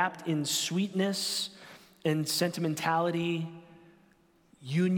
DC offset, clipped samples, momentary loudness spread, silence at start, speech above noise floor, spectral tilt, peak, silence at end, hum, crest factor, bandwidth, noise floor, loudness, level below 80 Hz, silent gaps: under 0.1%; under 0.1%; 15 LU; 0 s; 35 dB; -4.5 dB/octave; -14 dBFS; 0 s; none; 18 dB; 17.5 kHz; -64 dBFS; -30 LUFS; -76 dBFS; none